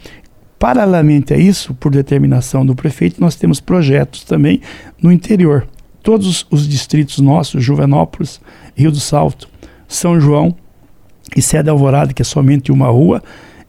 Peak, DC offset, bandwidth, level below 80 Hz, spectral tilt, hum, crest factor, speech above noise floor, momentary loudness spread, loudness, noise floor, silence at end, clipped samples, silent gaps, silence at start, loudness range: 0 dBFS; under 0.1%; 14.5 kHz; -36 dBFS; -6.5 dB/octave; none; 12 dB; 34 dB; 8 LU; -12 LUFS; -46 dBFS; 0.35 s; under 0.1%; none; 0.05 s; 2 LU